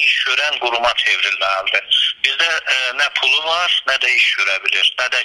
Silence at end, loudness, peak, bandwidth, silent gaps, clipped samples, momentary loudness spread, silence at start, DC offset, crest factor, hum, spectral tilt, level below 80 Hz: 0 s; -14 LUFS; 0 dBFS; 13.5 kHz; none; under 0.1%; 4 LU; 0 s; under 0.1%; 16 dB; none; 1.5 dB/octave; -58 dBFS